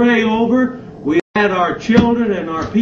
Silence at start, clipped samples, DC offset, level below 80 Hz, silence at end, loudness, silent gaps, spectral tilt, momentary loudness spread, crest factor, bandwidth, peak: 0 s; under 0.1%; under 0.1%; -40 dBFS; 0 s; -15 LUFS; 1.22-1.34 s; -6.5 dB/octave; 7 LU; 14 dB; 7.2 kHz; 0 dBFS